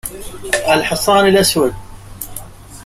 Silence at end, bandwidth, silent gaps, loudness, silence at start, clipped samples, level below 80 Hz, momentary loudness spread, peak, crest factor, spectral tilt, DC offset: 0 s; 16 kHz; none; -13 LUFS; 0.05 s; under 0.1%; -38 dBFS; 19 LU; 0 dBFS; 16 dB; -3.5 dB/octave; under 0.1%